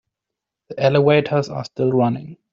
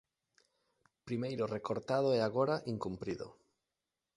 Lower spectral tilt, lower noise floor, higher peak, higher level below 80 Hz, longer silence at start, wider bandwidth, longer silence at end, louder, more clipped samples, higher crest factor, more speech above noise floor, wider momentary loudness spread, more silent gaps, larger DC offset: about the same, -6 dB/octave vs -7 dB/octave; second, -84 dBFS vs -90 dBFS; first, -2 dBFS vs -18 dBFS; first, -58 dBFS vs -70 dBFS; second, 0.7 s vs 1.05 s; second, 7.4 kHz vs 11.5 kHz; second, 0.2 s vs 0.85 s; first, -18 LUFS vs -36 LUFS; neither; about the same, 16 dB vs 20 dB; first, 66 dB vs 55 dB; about the same, 13 LU vs 11 LU; neither; neither